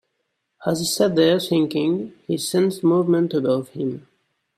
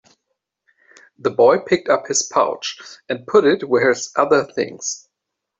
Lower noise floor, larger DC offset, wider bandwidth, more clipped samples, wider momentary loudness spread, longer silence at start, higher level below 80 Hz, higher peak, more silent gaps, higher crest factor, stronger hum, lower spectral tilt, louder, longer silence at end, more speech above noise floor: second, -75 dBFS vs -80 dBFS; neither; first, 16 kHz vs 8.2 kHz; neither; second, 10 LU vs 13 LU; second, 0.6 s vs 1.25 s; about the same, -64 dBFS vs -64 dBFS; about the same, -4 dBFS vs -2 dBFS; neither; about the same, 18 dB vs 16 dB; neither; first, -5.5 dB/octave vs -3 dB/octave; second, -21 LUFS vs -18 LUFS; about the same, 0.6 s vs 0.6 s; second, 55 dB vs 63 dB